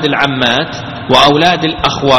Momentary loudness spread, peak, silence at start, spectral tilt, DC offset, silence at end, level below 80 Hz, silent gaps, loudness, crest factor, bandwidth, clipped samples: 9 LU; 0 dBFS; 0 s; -4.5 dB/octave; under 0.1%; 0 s; -38 dBFS; none; -10 LUFS; 10 dB; 18 kHz; 0.6%